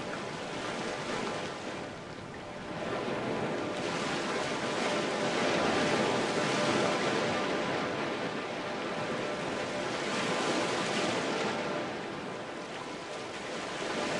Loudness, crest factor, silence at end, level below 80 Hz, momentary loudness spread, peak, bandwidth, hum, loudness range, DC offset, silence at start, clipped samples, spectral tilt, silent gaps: -33 LUFS; 18 dB; 0 s; -66 dBFS; 11 LU; -14 dBFS; 11.5 kHz; none; 6 LU; under 0.1%; 0 s; under 0.1%; -4 dB/octave; none